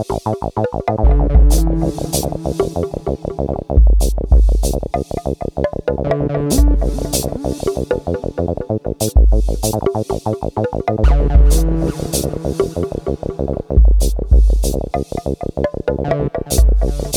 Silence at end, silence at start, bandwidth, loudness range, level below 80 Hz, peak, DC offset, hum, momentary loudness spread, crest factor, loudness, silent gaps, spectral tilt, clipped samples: 0 s; 0 s; 16 kHz; 2 LU; -16 dBFS; 0 dBFS; under 0.1%; none; 9 LU; 14 dB; -17 LUFS; none; -6 dB/octave; under 0.1%